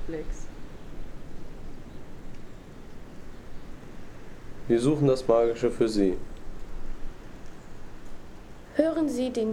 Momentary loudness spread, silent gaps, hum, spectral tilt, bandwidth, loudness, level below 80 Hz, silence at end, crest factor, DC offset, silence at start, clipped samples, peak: 24 LU; none; none; -7 dB/octave; 12 kHz; -26 LUFS; -40 dBFS; 0 s; 20 dB; under 0.1%; 0 s; under 0.1%; -8 dBFS